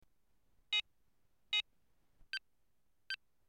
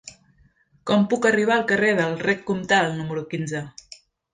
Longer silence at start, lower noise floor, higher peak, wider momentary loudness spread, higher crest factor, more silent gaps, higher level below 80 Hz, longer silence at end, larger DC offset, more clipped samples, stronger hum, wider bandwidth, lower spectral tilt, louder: first, 0.7 s vs 0.05 s; first, -83 dBFS vs -59 dBFS; second, -26 dBFS vs -6 dBFS; second, 9 LU vs 13 LU; about the same, 20 dB vs 16 dB; neither; second, -76 dBFS vs -60 dBFS; second, 0.35 s vs 0.65 s; neither; neither; neither; first, 15.5 kHz vs 9.6 kHz; second, 2.5 dB/octave vs -5 dB/octave; second, -39 LUFS vs -22 LUFS